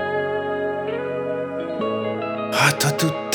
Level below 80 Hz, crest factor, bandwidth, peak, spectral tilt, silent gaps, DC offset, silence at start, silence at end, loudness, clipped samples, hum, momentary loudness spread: -64 dBFS; 20 dB; over 20 kHz; -2 dBFS; -4 dB/octave; none; under 0.1%; 0 s; 0 s; -22 LUFS; under 0.1%; none; 8 LU